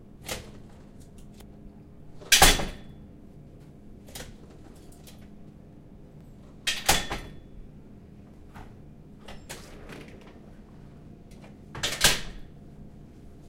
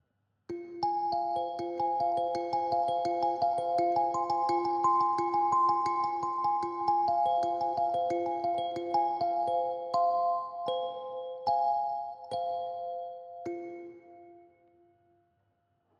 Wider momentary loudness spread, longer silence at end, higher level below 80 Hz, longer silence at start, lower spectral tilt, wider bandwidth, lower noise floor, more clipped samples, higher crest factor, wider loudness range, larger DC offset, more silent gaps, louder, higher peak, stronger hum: first, 27 LU vs 12 LU; second, 0 s vs 1.6 s; first, -40 dBFS vs -78 dBFS; second, 0 s vs 0.5 s; second, -1.5 dB/octave vs -5.5 dB/octave; first, 16 kHz vs 9.8 kHz; second, -48 dBFS vs -75 dBFS; neither; first, 30 dB vs 14 dB; first, 21 LU vs 8 LU; neither; neither; first, -24 LUFS vs -30 LUFS; first, -2 dBFS vs -16 dBFS; neither